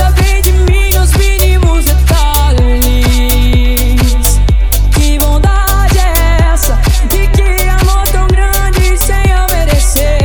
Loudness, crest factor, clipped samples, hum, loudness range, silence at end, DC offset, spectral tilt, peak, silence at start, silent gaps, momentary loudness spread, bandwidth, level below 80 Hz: -10 LUFS; 8 dB; under 0.1%; none; 1 LU; 0 s; under 0.1%; -4.5 dB/octave; 0 dBFS; 0 s; none; 2 LU; over 20 kHz; -8 dBFS